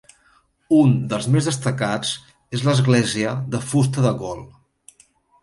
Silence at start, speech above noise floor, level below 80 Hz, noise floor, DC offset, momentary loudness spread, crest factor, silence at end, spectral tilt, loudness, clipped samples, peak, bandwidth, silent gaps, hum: 0.7 s; 40 dB; -54 dBFS; -59 dBFS; under 0.1%; 12 LU; 18 dB; 0.95 s; -6 dB/octave; -20 LUFS; under 0.1%; -4 dBFS; 11.5 kHz; none; none